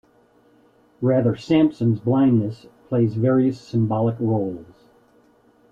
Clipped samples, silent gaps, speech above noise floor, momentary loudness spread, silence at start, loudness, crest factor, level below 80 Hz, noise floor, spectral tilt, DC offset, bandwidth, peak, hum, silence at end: under 0.1%; none; 37 dB; 9 LU; 1 s; -21 LUFS; 14 dB; -58 dBFS; -57 dBFS; -9.5 dB/octave; under 0.1%; 7.4 kHz; -6 dBFS; none; 1.1 s